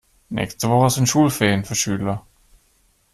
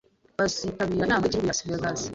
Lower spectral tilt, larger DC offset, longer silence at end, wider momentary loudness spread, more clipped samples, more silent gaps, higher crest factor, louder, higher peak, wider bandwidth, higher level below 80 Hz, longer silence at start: about the same, -4.5 dB/octave vs -4 dB/octave; neither; first, 0.95 s vs 0 s; first, 10 LU vs 5 LU; neither; neither; about the same, 18 dB vs 16 dB; first, -19 LUFS vs -26 LUFS; first, -4 dBFS vs -10 dBFS; first, 14.5 kHz vs 8.2 kHz; about the same, -50 dBFS vs -50 dBFS; about the same, 0.3 s vs 0.4 s